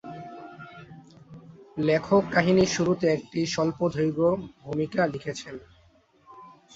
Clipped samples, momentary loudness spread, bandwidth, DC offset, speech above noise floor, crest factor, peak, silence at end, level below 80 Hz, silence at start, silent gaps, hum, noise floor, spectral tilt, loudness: under 0.1%; 21 LU; 8 kHz; under 0.1%; 35 dB; 20 dB; -8 dBFS; 0.25 s; -58 dBFS; 0.05 s; none; none; -60 dBFS; -5.5 dB/octave; -25 LUFS